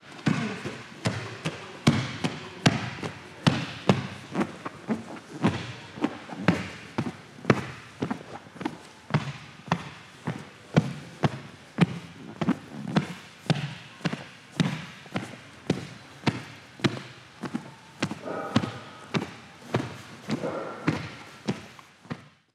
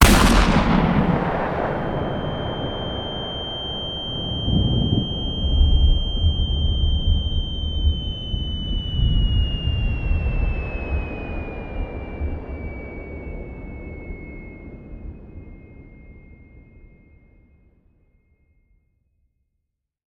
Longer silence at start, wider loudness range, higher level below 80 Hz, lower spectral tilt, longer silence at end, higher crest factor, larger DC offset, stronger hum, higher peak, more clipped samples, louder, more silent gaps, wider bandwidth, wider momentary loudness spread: about the same, 0.05 s vs 0 s; second, 5 LU vs 18 LU; second, -62 dBFS vs -26 dBFS; about the same, -6 dB/octave vs -5.5 dB/octave; second, 0.25 s vs 3.5 s; first, 30 dB vs 22 dB; neither; neither; about the same, 0 dBFS vs 0 dBFS; neither; second, -31 LUFS vs -23 LUFS; neither; second, 13 kHz vs 16.5 kHz; second, 14 LU vs 18 LU